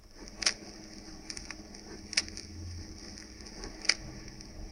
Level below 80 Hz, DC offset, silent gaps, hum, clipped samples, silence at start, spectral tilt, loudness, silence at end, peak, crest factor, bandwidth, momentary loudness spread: -52 dBFS; under 0.1%; none; none; under 0.1%; 0 s; -1 dB/octave; -35 LUFS; 0 s; -6 dBFS; 34 dB; 16.5 kHz; 17 LU